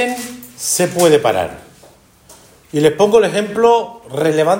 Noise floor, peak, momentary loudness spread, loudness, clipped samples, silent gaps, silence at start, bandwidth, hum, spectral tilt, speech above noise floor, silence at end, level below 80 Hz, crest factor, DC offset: -46 dBFS; 0 dBFS; 13 LU; -15 LUFS; under 0.1%; none; 0 s; 17 kHz; none; -4 dB/octave; 32 dB; 0 s; -54 dBFS; 14 dB; under 0.1%